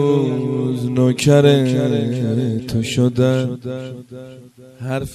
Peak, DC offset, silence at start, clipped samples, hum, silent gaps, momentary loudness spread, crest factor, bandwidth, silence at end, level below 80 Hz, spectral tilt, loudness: 0 dBFS; under 0.1%; 0 s; under 0.1%; none; none; 18 LU; 18 dB; 13.5 kHz; 0 s; -48 dBFS; -6.5 dB/octave; -17 LUFS